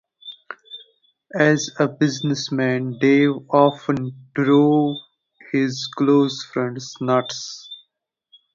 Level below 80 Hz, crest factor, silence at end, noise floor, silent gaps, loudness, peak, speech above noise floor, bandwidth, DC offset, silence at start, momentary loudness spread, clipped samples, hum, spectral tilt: -64 dBFS; 20 dB; 0.8 s; -73 dBFS; none; -20 LUFS; 0 dBFS; 54 dB; 7.6 kHz; under 0.1%; 0.25 s; 20 LU; under 0.1%; none; -5.5 dB/octave